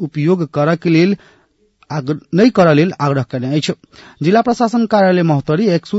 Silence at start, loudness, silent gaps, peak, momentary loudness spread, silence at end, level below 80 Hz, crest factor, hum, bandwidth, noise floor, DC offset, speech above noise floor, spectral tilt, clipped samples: 0 s; -14 LUFS; none; 0 dBFS; 10 LU; 0 s; -54 dBFS; 14 dB; none; 8 kHz; -55 dBFS; under 0.1%; 41 dB; -7 dB/octave; under 0.1%